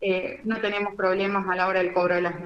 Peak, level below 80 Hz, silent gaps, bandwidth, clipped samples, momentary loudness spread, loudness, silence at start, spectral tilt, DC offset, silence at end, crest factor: -10 dBFS; -60 dBFS; none; 7.2 kHz; under 0.1%; 5 LU; -25 LUFS; 0 s; -7 dB/octave; under 0.1%; 0 s; 16 dB